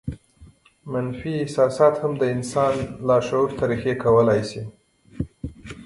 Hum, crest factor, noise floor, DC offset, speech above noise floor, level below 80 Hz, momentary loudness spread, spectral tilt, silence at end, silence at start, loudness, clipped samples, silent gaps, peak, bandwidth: none; 18 dB; -50 dBFS; under 0.1%; 30 dB; -48 dBFS; 18 LU; -6.5 dB/octave; 0 s; 0.05 s; -22 LUFS; under 0.1%; none; -4 dBFS; 11.5 kHz